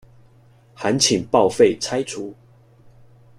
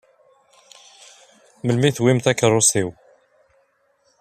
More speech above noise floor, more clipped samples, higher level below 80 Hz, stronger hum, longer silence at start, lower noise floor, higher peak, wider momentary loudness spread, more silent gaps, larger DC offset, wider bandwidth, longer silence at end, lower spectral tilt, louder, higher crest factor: second, 33 dB vs 46 dB; neither; about the same, -56 dBFS vs -60 dBFS; neither; second, 0.8 s vs 1.65 s; second, -52 dBFS vs -63 dBFS; about the same, -2 dBFS vs -2 dBFS; first, 14 LU vs 11 LU; neither; neither; about the same, 15 kHz vs 14.5 kHz; second, 1.05 s vs 1.3 s; about the same, -3.5 dB/octave vs -4 dB/octave; about the same, -19 LUFS vs -18 LUFS; about the same, 20 dB vs 20 dB